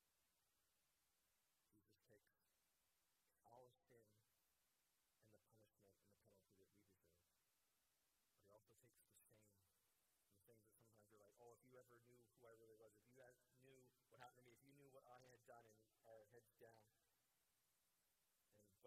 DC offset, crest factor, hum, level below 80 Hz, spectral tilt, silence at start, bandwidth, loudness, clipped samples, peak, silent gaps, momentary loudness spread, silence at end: under 0.1%; 28 dB; none; under -90 dBFS; -4.5 dB/octave; 0 s; 15 kHz; -69 LUFS; under 0.1%; -48 dBFS; none; 2 LU; 0 s